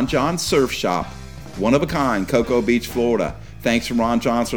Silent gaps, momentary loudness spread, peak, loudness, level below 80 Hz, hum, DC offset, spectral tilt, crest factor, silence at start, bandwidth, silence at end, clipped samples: none; 7 LU; -4 dBFS; -20 LUFS; -40 dBFS; none; 0.8%; -5 dB/octave; 16 dB; 0 s; over 20 kHz; 0 s; under 0.1%